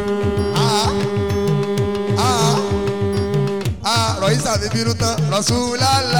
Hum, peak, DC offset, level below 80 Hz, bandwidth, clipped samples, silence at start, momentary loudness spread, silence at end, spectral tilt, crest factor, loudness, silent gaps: none; -6 dBFS; 1%; -38 dBFS; 19 kHz; under 0.1%; 0 s; 4 LU; 0 s; -4.5 dB/octave; 12 dB; -18 LUFS; none